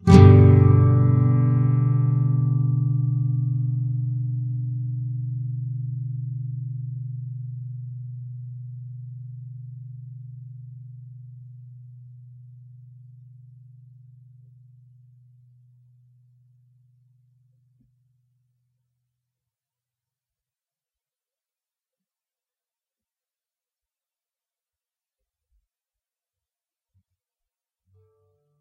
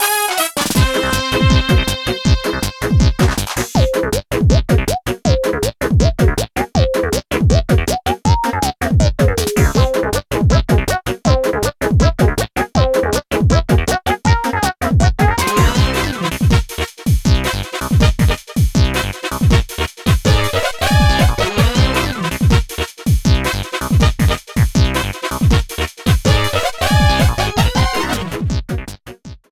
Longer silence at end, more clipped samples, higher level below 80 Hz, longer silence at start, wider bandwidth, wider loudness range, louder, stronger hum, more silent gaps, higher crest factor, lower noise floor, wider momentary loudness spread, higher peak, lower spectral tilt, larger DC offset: first, 16.5 s vs 0.15 s; neither; second, -48 dBFS vs -20 dBFS; about the same, 0 s vs 0 s; second, 7.2 kHz vs 16 kHz; first, 25 LU vs 1 LU; second, -21 LUFS vs -15 LUFS; neither; neither; first, 24 dB vs 14 dB; first, under -90 dBFS vs -35 dBFS; first, 25 LU vs 6 LU; about the same, 0 dBFS vs 0 dBFS; first, -9.5 dB/octave vs -5 dB/octave; neither